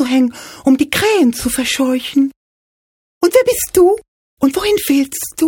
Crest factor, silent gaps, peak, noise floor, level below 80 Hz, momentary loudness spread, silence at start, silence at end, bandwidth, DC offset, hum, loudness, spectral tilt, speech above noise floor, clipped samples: 14 dB; 2.36-3.21 s, 4.08-4.37 s; 0 dBFS; under -90 dBFS; -44 dBFS; 7 LU; 0 s; 0 s; 19 kHz; under 0.1%; none; -14 LUFS; -3 dB/octave; over 76 dB; under 0.1%